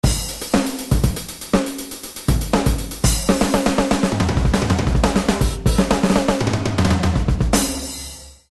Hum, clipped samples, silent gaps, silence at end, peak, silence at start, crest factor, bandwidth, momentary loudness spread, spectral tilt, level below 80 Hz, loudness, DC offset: none; under 0.1%; none; 0.2 s; -4 dBFS; 0.05 s; 16 dB; 13 kHz; 9 LU; -5 dB/octave; -24 dBFS; -19 LUFS; under 0.1%